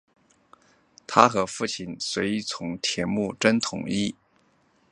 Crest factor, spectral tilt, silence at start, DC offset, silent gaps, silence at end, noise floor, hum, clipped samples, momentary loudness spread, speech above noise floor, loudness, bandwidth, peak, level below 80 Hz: 26 dB; -4 dB/octave; 1.1 s; under 0.1%; none; 0.8 s; -64 dBFS; none; under 0.1%; 11 LU; 39 dB; -25 LUFS; 11 kHz; 0 dBFS; -60 dBFS